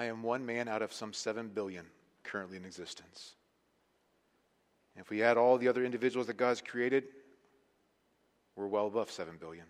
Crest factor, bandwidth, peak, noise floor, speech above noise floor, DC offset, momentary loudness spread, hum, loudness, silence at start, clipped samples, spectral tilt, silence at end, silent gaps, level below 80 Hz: 22 dB; 13 kHz; -14 dBFS; -75 dBFS; 41 dB; under 0.1%; 21 LU; none; -34 LUFS; 0 s; under 0.1%; -4.5 dB/octave; 0.05 s; none; -82 dBFS